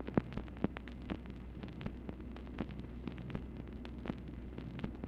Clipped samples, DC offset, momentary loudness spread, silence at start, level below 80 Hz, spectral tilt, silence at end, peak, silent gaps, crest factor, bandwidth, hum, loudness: under 0.1%; under 0.1%; 7 LU; 0 s; -50 dBFS; -9 dB/octave; 0 s; -16 dBFS; none; 28 dB; 7.2 kHz; none; -45 LUFS